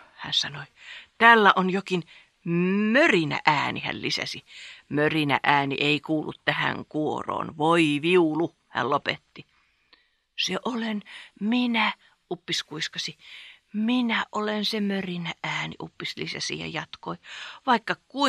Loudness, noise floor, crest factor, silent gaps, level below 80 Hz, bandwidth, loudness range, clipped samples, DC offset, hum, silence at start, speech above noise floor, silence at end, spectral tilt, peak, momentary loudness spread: -24 LUFS; -63 dBFS; 24 dB; none; -68 dBFS; 13.5 kHz; 8 LU; under 0.1%; under 0.1%; none; 0.2 s; 38 dB; 0 s; -4.5 dB/octave; -2 dBFS; 17 LU